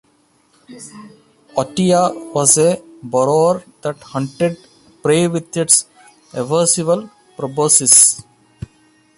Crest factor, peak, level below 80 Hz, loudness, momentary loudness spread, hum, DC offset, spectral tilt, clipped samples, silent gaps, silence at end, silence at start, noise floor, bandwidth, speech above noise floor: 18 dB; 0 dBFS; -54 dBFS; -14 LUFS; 17 LU; none; under 0.1%; -3.5 dB/octave; under 0.1%; none; 0.95 s; 0.7 s; -57 dBFS; 16 kHz; 41 dB